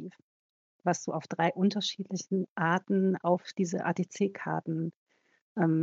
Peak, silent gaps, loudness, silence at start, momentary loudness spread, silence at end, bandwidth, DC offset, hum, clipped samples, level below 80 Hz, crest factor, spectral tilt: -12 dBFS; 0.22-0.79 s, 2.50-2.56 s, 4.96-5.07 s, 5.41-5.55 s; -31 LUFS; 0 s; 8 LU; 0 s; 7.8 kHz; under 0.1%; none; under 0.1%; -86 dBFS; 18 dB; -5.5 dB/octave